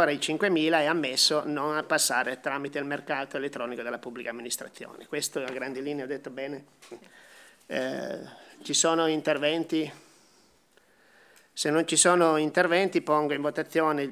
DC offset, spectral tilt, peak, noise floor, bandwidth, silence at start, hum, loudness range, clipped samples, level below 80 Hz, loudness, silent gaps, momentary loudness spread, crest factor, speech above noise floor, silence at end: under 0.1%; -2.5 dB/octave; -6 dBFS; -63 dBFS; 16 kHz; 0 s; none; 10 LU; under 0.1%; -84 dBFS; -27 LUFS; none; 14 LU; 22 dB; 36 dB; 0 s